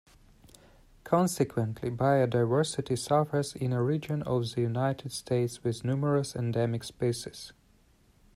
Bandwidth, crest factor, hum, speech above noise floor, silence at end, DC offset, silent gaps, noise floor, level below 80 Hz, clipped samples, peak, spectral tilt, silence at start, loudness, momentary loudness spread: 14.5 kHz; 18 dB; none; 34 dB; 0.85 s; under 0.1%; none; -63 dBFS; -60 dBFS; under 0.1%; -12 dBFS; -6.5 dB/octave; 1.05 s; -29 LUFS; 6 LU